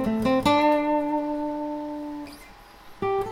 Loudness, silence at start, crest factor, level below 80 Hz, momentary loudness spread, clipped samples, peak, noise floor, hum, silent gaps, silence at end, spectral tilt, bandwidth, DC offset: -25 LUFS; 0 s; 16 dB; -50 dBFS; 17 LU; under 0.1%; -10 dBFS; -47 dBFS; none; none; 0 s; -6 dB/octave; 16 kHz; under 0.1%